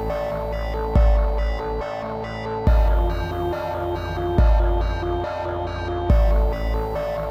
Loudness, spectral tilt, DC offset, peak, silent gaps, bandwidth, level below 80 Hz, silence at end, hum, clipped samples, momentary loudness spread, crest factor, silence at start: -23 LUFS; -8 dB/octave; under 0.1%; -6 dBFS; none; 6.2 kHz; -22 dBFS; 0 s; none; under 0.1%; 8 LU; 16 dB; 0 s